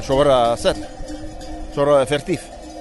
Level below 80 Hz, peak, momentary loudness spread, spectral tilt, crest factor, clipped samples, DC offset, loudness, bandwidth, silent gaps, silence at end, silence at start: -36 dBFS; -4 dBFS; 18 LU; -5 dB/octave; 16 dB; under 0.1%; under 0.1%; -18 LUFS; 11.5 kHz; none; 0 s; 0 s